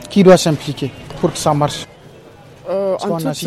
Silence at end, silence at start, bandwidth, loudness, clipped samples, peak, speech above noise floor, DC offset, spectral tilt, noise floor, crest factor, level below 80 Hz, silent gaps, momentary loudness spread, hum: 0 s; 0 s; 14.5 kHz; -16 LUFS; under 0.1%; 0 dBFS; 26 dB; under 0.1%; -5.5 dB/octave; -40 dBFS; 16 dB; -46 dBFS; none; 17 LU; none